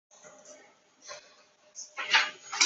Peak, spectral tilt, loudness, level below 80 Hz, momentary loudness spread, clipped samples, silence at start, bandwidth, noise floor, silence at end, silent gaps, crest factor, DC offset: -8 dBFS; 3 dB/octave; -27 LUFS; under -90 dBFS; 27 LU; under 0.1%; 0.25 s; 8.2 kHz; -61 dBFS; 0 s; none; 26 dB; under 0.1%